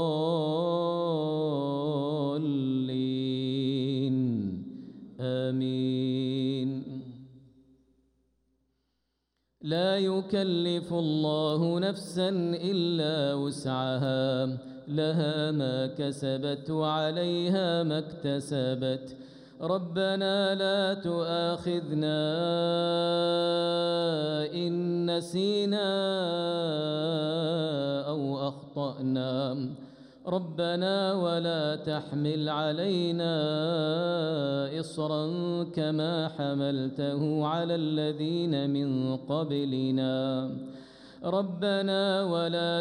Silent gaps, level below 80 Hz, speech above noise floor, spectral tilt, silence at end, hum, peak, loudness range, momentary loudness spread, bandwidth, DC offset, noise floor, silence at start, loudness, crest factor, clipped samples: none; -72 dBFS; 50 dB; -7 dB/octave; 0 s; none; -16 dBFS; 4 LU; 6 LU; 11.5 kHz; under 0.1%; -79 dBFS; 0 s; -29 LUFS; 14 dB; under 0.1%